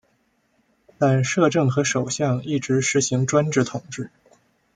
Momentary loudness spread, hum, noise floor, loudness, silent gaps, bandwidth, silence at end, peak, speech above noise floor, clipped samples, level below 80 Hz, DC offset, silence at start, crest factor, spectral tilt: 11 LU; none; -66 dBFS; -21 LUFS; none; 9.6 kHz; 0.7 s; -4 dBFS; 45 dB; under 0.1%; -62 dBFS; under 0.1%; 1 s; 18 dB; -5 dB/octave